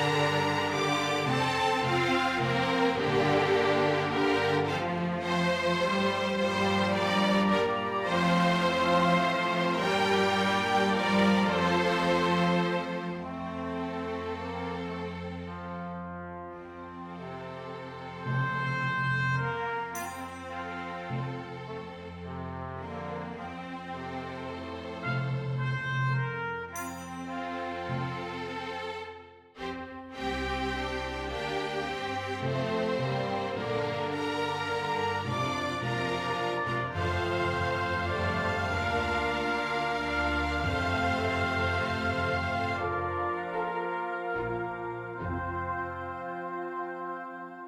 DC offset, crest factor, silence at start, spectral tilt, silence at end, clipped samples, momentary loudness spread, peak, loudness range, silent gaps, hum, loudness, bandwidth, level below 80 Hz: under 0.1%; 16 dB; 0 s; -5.5 dB/octave; 0 s; under 0.1%; 13 LU; -14 dBFS; 11 LU; none; none; -30 LUFS; 16 kHz; -52 dBFS